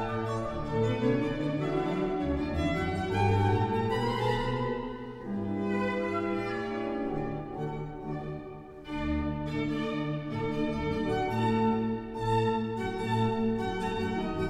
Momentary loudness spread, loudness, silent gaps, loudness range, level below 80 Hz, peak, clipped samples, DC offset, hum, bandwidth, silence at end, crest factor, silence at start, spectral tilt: 9 LU; -31 LUFS; none; 5 LU; -46 dBFS; -14 dBFS; under 0.1%; under 0.1%; none; 12.5 kHz; 0 s; 16 dB; 0 s; -7.5 dB/octave